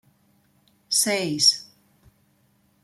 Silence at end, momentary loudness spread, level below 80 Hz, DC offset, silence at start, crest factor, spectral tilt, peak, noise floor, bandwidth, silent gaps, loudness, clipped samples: 1.2 s; 7 LU; -70 dBFS; under 0.1%; 0.9 s; 22 dB; -1.5 dB/octave; -6 dBFS; -64 dBFS; 16 kHz; none; -20 LUFS; under 0.1%